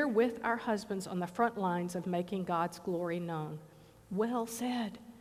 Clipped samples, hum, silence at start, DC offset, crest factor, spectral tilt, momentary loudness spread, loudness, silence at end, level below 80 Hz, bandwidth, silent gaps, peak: under 0.1%; none; 0 s; under 0.1%; 18 dB; -6 dB/octave; 8 LU; -35 LUFS; 0 s; -70 dBFS; 15.5 kHz; none; -16 dBFS